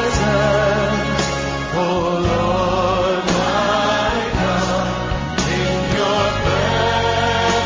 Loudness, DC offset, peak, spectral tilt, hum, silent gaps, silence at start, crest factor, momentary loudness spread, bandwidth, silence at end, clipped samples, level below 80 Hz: -18 LUFS; under 0.1%; 0 dBFS; -5 dB/octave; none; none; 0 s; 16 dB; 4 LU; 7.6 kHz; 0 s; under 0.1%; -30 dBFS